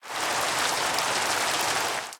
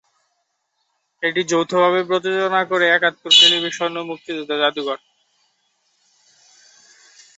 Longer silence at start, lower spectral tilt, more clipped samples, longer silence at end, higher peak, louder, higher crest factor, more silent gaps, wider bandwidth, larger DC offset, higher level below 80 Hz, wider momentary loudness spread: second, 0.05 s vs 1.2 s; second, -0.5 dB/octave vs -2 dB/octave; neither; second, 0 s vs 2.4 s; second, -8 dBFS vs 0 dBFS; second, -25 LUFS vs -17 LUFS; about the same, 20 dB vs 20 dB; neither; first, 19 kHz vs 8.2 kHz; neither; first, -64 dBFS vs -70 dBFS; second, 2 LU vs 17 LU